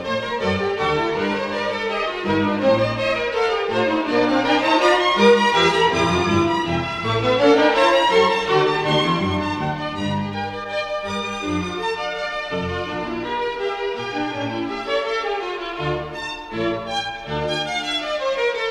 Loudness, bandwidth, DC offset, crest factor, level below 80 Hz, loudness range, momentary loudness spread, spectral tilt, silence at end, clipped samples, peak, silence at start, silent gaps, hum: -20 LUFS; 12 kHz; under 0.1%; 18 dB; -48 dBFS; 8 LU; 10 LU; -5 dB/octave; 0 s; under 0.1%; -2 dBFS; 0 s; none; none